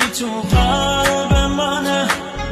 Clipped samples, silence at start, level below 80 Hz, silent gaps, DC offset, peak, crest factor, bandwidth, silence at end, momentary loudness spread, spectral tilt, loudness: under 0.1%; 0 s; -24 dBFS; none; under 0.1%; -4 dBFS; 14 dB; 14 kHz; 0 s; 4 LU; -4 dB/octave; -17 LUFS